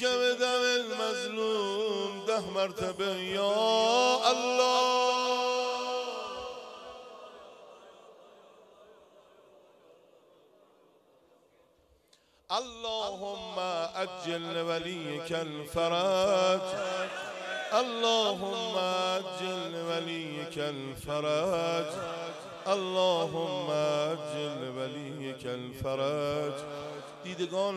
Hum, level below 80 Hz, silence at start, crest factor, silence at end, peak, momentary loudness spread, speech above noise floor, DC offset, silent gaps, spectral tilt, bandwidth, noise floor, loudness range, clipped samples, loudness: none; -66 dBFS; 0 s; 20 dB; 0 s; -12 dBFS; 13 LU; 35 dB; under 0.1%; none; -3.5 dB/octave; 14 kHz; -66 dBFS; 12 LU; under 0.1%; -31 LUFS